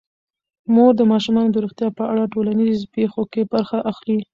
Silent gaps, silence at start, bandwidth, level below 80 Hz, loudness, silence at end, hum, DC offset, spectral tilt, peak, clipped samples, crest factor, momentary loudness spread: none; 0.7 s; 7.2 kHz; -58 dBFS; -18 LUFS; 0.1 s; none; under 0.1%; -7.5 dB/octave; -2 dBFS; under 0.1%; 16 dB; 9 LU